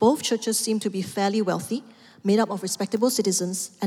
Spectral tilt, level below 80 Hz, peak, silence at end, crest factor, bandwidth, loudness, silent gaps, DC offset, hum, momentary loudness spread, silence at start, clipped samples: -4 dB/octave; -74 dBFS; -8 dBFS; 0 s; 16 dB; 16.5 kHz; -24 LUFS; none; under 0.1%; none; 7 LU; 0 s; under 0.1%